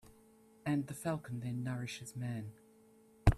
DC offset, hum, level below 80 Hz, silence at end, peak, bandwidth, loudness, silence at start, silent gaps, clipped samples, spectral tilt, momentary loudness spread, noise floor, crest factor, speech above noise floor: under 0.1%; none; -46 dBFS; 0 s; -10 dBFS; 14 kHz; -40 LUFS; 0.05 s; none; under 0.1%; -6.5 dB/octave; 8 LU; -64 dBFS; 28 dB; 24 dB